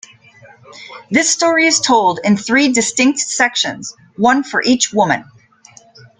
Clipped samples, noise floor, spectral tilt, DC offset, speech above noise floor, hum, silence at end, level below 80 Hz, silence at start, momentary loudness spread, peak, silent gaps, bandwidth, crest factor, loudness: under 0.1%; -45 dBFS; -2.5 dB/octave; under 0.1%; 31 dB; none; 1 s; -58 dBFS; 0.7 s; 9 LU; 0 dBFS; none; 9.6 kHz; 16 dB; -14 LUFS